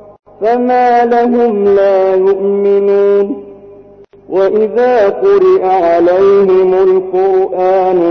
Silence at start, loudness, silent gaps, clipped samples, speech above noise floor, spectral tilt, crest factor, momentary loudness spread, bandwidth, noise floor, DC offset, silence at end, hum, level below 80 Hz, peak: 0.4 s; -10 LUFS; none; under 0.1%; 29 dB; -8 dB/octave; 6 dB; 5 LU; 6 kHz; -38 dBFS; under 0.1%; 0 s; 50 Hz at -55 dBFS; -50 dBFS; -4 dBFS